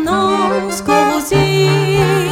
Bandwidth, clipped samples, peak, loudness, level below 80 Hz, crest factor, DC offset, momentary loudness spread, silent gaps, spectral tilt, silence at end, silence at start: 16.5 kHz; under 0.1%; -2 dBFS; -13 LUFS; -38 dBFS; 12 dB; under 0.1%; 3 LU; none; -5 dB/octave; 0 s; 0 s